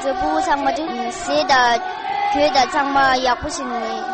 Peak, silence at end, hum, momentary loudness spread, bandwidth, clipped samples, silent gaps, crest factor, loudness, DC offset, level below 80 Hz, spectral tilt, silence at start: -4 dBFS; 0 s; none; 9 LU; 8.8 kHz; under 0.1%; none; 14 dB; -18 LUFS; under 0.1%; -44 dBFS; -2.5 dB/octave; 0 s